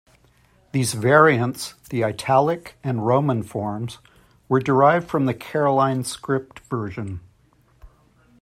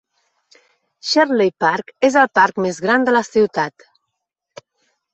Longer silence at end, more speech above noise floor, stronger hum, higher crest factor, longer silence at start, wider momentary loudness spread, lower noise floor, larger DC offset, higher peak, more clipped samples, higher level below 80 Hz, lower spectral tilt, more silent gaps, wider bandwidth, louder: second, 0.55 s vs 1.45 s; second, 38 dB vs 62 dB; neither; about the same, 20 dB vs 16 dB; second, 0.75 s vs 1.05 s; first, 14 LU vs 7 LU; second, -58 dBFS vs -78 dBFS; neither; about the same, -2 dBFS vs -2 dBFS; neither; first, -56 dBFS vs -64 dBFS; first, -6 dB/octave vs -4 dB/octave; neither; first, 15.5 kHz vs 8.4 kHz; second, -21 LUFS vs -16 LUFS